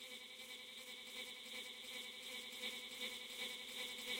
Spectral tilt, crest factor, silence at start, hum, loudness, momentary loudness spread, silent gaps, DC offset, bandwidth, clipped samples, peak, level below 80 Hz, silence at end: 0.5 dB/octave; 18 dB; 0 s; none; -48 LUFS; 5 LU; none; under 0.1%; 16.5 kHz; under 0.1%; -32 dBFS; -88 dBFS; 0 s